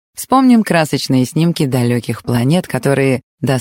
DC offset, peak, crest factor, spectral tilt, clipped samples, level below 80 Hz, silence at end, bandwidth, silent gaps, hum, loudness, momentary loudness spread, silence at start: under 0.1%; -2 dBFS; 12 dB; -6 dB/octave; under 0.1%; -50 dBFS; 0 s; 17 kHz; 3.23-3.38 s; none; -14 LUFS; 8 LU; 0.15 s